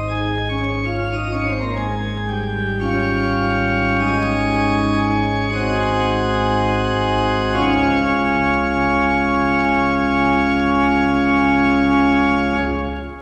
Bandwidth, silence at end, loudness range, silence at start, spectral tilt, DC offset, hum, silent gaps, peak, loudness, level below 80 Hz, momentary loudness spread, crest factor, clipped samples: 8.8 kHz; 0 s; 4 LU; 0 s; -7 dB/octave; under 0.1%; none; none; -4 dBFS; -18 LUFS; -32 dBFS; 7 LU; 12 dB; under 0.1%